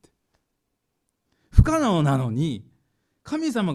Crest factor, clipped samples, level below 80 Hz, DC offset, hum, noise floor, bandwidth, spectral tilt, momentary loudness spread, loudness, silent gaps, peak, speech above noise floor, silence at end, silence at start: 24 dB; under 0.1%; -30 dBFS; under 0.1%; none; -77 dBFS; 13 kHz; -7 dB/octave; 10 LU; -22 LUFS; none; 0 dBFS; 54 dB; 0 s; 1.55 s